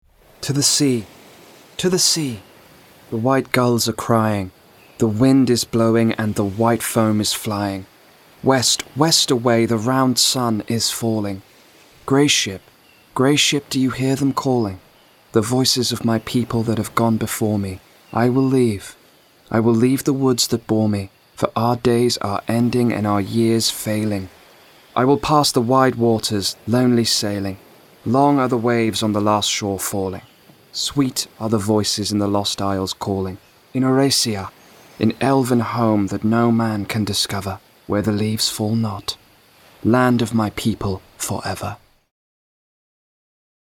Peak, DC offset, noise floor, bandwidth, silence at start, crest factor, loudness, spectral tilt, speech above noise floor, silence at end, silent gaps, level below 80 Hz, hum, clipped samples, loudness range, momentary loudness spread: 0 dBFS; under 0.1%; -52 dBFS; 18.5 kHz; 0.4 s; 20 dB; -18 LUFS; -4.5 dB/octave; 34 dB; 1.95 s; none; -52 dBFS; none; under 0.1%; 3 LU; 11 LU